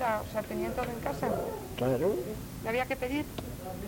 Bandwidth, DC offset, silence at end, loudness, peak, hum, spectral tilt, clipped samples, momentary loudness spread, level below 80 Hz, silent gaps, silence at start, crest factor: 17 kHz; under 0.1%; 0 s; -33 LUFS; -18 dBFS; none; -6 dB/octave; under 0.1%; 9 LU; -48 dBFS; none; 0 s; 16 dB